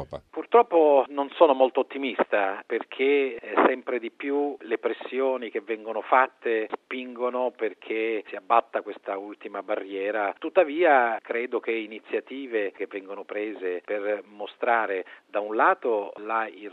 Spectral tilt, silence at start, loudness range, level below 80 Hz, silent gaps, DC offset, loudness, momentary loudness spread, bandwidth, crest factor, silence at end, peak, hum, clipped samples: -6.5 dB/octave; 0 s; 6 LU; -72 dBFS; none; under 0.1%; -26 LUFS; 13 LU; 4.3 kHz; 22 dB; 0 s; -4 dBFS; none; under 0.1%